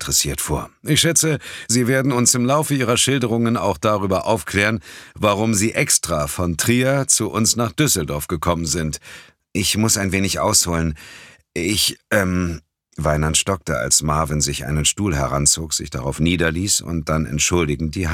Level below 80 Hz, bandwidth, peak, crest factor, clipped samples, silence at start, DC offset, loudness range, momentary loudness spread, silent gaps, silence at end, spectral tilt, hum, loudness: -36 dBFS; 17.5 kHz; -2 dBFS; 18 dB; under 0.1%; 0 s; under 0.1%; 2 LU; 8 LU; none; 0 s; -3.5 dB/octave; none; -18 LUFS